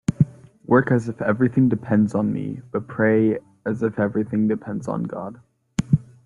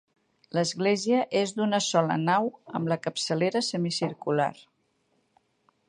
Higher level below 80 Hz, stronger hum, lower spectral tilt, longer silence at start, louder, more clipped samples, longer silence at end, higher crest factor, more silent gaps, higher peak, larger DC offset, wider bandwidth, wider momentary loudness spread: first, -52 dBFS vs -74 dBFS; neither; first, -8.5 dB/octave vs -4.5 dB/octave; second, 0.1 s vs 0.55 s; first, -22 LUFS vs -27 LUFS; neither; second, 0.25 s vs 1.35 s; about the same, 18 dB vs 20 dB; neither; first, -4 dBFS vs -8 dBFS; neither; about the same, 11 kHz vs 11.5 kHz; first, 11 LU vs 5 LU